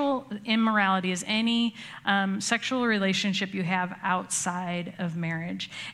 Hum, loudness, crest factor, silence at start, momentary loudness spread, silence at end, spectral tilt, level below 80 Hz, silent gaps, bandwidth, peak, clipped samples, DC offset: none; -27 LUFS; 20 dB; 0 s; 8 LU; 0 s; -4 dB/octave; -72 dBFS; none; 13.5 kHz; -8 dBFS; under 0.1%; under 0.1%